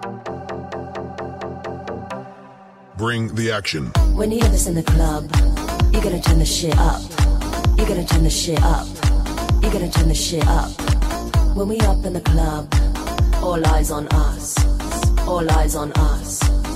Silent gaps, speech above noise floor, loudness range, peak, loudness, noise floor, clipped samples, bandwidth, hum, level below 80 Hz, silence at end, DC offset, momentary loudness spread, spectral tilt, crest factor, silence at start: none; 26 dB; 5 LU; -4 dBFS; -19 LUFS; -43 dBFS; under 0.1%; 15.5 kHz; none; -20 dBFS; 0 s; under 0.1%; 12 LU; -5 dB/octave; 14 dB; 0 s